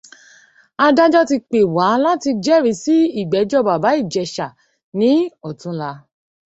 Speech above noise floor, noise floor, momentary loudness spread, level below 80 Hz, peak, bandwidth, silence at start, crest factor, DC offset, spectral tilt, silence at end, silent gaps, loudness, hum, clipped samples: 35 dB; -50 dBFS; 14 LU; -60 dBFS; -2 dBFS; 8.2 kHz; 0.8 s; 16 dB; under 0.1%; -5.5 dB/octave; 0.5 s; 4.83-4.92 s; -16 LUFS; none; under 0.1%